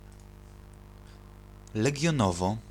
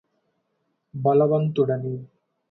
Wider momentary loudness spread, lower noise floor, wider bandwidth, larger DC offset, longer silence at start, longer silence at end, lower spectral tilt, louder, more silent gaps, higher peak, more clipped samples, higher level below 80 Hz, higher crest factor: first, 25 LU vs 16 LU; second, -49 dBFS vs -74 dBFS; first, 15 kHz vs 4.1 kHz; neither; second, 0.05 s vs 0.95 s; second, 0 s vs 0.45 s; second, -5.5 dB/octave vs -11 dB/octave; second, -28 LUFS vs -22 LUFS; neither; second, -12 dBFS vs -8 dBFS; neither; first, -50 dBFS vs -66 dBFS; about the same, 20 dB vs 16 dB